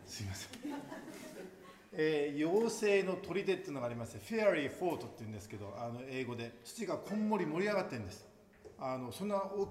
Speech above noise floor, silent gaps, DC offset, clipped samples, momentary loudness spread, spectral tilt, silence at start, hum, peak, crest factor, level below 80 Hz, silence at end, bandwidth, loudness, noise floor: 22 dB; none; under 0.1%; under 0.1%; 16 LU; -5.5 dB/octave; 0 s; none; -18 dBFS; 20 dB; -72 dBFS; 0 s; 16 kHz; -37 LUFS; -58 dBFS